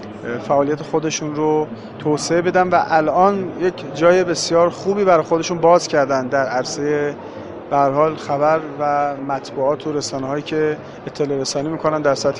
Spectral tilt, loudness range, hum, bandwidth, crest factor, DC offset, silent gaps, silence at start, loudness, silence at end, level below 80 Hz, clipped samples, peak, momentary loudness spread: -5 dB/octave; 5 LU; none; 11 kHz; 18 dB; under 0.1%; none; 0 s; -18 LUFS; 0 s; -54 dBFS; under 0.1%; 0 dBFS; 10 LU